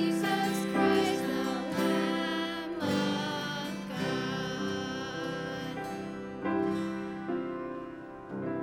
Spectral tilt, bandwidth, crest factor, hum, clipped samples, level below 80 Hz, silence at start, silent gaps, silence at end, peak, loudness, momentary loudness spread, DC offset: -5 dB/octave; 17 kHz; 18 dB; none; under 0.1%; -64 dBFS; 0 s; none; 0 s; -14 dBFS; -32 LUFS; 10 LU; under 0.1%